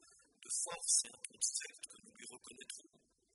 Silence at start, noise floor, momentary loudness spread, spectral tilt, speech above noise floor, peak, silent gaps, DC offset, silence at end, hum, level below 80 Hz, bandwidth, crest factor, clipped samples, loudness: 0.4 s; -61 dBFS; 20 LU; 2 dB/octave; 19 dB; -20 dBFS; none; under 0.1%; 0.55 s; none; -88 dBFS; 11.5 kHz; 24 dB; under 0.1%; -37 LUFS